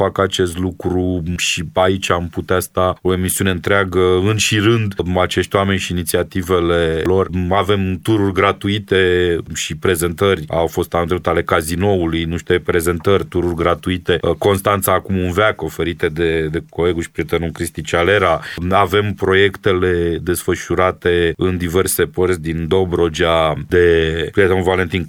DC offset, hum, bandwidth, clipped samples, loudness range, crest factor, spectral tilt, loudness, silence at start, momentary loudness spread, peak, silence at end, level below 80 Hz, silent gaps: under 0.1%; none; 19 kHz; under 0.1%; 2 LU; 16 dB; -5 dB/octave; -16 LUFS; 0 s; 5 LU; 0 dBFS; 0 s; -36 dBFS; none